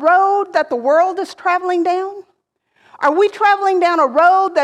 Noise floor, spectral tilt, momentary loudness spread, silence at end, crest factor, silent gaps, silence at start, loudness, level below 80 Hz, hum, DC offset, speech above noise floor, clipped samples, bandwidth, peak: -64 dBFS; -3 dB/octave; 7 LU; 0 s; 12 dB; none; 0 s; -15 LUFS; -70 dBFS; none; under 0.1%; 49 dB; under 0.1%; 11 kHz; -2 dBFS